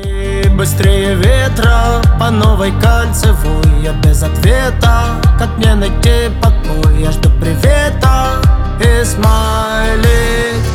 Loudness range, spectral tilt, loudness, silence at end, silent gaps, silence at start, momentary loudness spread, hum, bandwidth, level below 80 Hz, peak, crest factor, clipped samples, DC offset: 1 LU; -5.5 dB/octave; -11 LUFS; 0 s; none; 0 s; 2 LU; none; 16.5 kHz; -12 dBFS; 0 dBFS; 10 dB; under 0.1%; under 0.1%